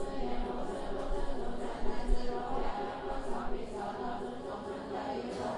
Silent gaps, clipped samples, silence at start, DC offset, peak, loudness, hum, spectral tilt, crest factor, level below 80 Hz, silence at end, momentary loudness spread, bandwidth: none; under 0.1%; 0 s; under 0.1%; -16 dBFS; -39 LUFS; none; -6 dB/octave; 18 dB; -40 dBFS; 0 s; 3 LU; 10.5 kHz